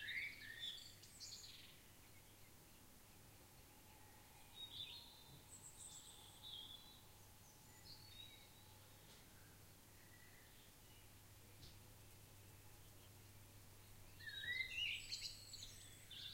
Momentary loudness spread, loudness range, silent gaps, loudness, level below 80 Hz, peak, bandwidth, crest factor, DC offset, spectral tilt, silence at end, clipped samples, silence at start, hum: 17 LU; 14 LU; none; -54 LUFS; -72 dBFS; -32 dBFS; 16 kHz; 24 dB; under 0.1%; -1 dB/octave; 0 s; under 0.1%; 0 s; none